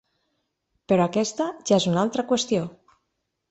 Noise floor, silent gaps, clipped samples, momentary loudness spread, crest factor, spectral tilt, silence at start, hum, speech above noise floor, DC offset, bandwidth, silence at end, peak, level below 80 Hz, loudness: -78 dBFS; none; under 0.1%; 6 LU; 18 dB; -5 dB/octave; 0.9 s; none; 55 dB; under 0.1%; 8.2 kHz; 0.8 s; -6 dBFS; -64 dBFS; -23 LUFS